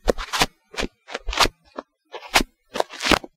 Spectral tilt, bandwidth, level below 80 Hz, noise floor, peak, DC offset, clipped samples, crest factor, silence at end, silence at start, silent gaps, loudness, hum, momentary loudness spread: -2.5 dB/octave; 17.5 kHz; -36 dBFS; -41 dBFS; -2 dBFS; under 0.1%; under 0.1%; 24 dB; 0.1 s; 0.05 s; none; -23 LUFS; none; 20 LU